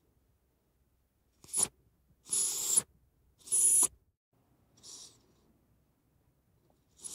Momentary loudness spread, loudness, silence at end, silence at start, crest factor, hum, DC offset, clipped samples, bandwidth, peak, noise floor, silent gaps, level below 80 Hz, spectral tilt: 25 LU; -28 LUFS; 0 s; 1.5 s; 22 dB; none; under 0.1%; under 0.1%; 16 kHz; -14 dBFS; -74 dBFS; 4.17-4.32 s; -74 dBFS; 0.5 dB/octave